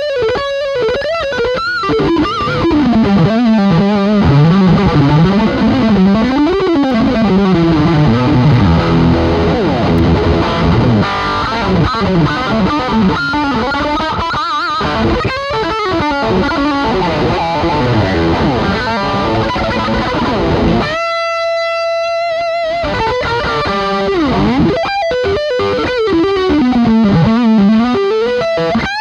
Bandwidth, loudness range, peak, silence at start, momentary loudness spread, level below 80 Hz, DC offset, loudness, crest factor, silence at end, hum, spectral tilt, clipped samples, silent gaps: 8.8 kHz; 4 LU; 0 dBFS; 0 s; 5 LU; -28 dBFS; under 0.1%; -12 LUFS; 12 dB; 0 s; none; -7 dB/octave; under 0.1%; none